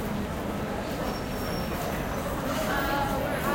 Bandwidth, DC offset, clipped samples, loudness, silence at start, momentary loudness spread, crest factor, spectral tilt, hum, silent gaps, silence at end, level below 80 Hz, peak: 16.5 kHz; under 0.1%; under 0.1%; -30 LUFS; 0 s; 5 LU; 14 dB; -5 dB/octave; none; none; 0 s; -40 dBFS; -14 dBFS